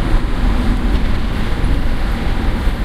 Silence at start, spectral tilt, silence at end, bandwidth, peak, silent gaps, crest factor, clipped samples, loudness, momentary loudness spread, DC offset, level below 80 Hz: 0 s; -6.5 dB/octave; 0 s; 12.5 kHz; -2 dBFS; none; 12 dB; under 0.1%; -19 LUFS; 3 LU; under 0.1%; -16 dBFS